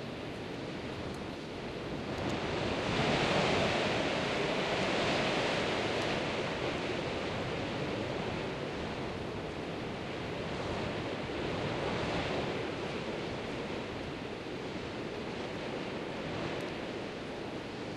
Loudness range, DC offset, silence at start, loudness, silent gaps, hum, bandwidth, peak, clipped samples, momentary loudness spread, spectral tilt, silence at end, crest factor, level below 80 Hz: 8 LU; under 0.1%; 0 s; -35 LUFS; none; none; 12.5 kHz; -16 dBFS; under 0.1%; 10 LU; -5 dB/octave; 0 s; 18 dB; -54 dBFS